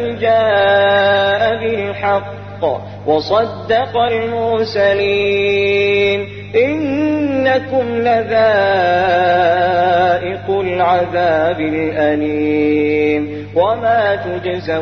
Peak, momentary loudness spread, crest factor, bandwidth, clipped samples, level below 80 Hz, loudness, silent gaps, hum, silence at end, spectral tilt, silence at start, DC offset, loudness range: -2 dBFS; 7 LU; 12 dB; 6.4 kHz; under 0.1%; -48 dBFS; -14 LUFS; none; 50 Hz at -30 dBFS; 0 s; -6.5 dB/octave; 0 s; 0.3%; 3 LU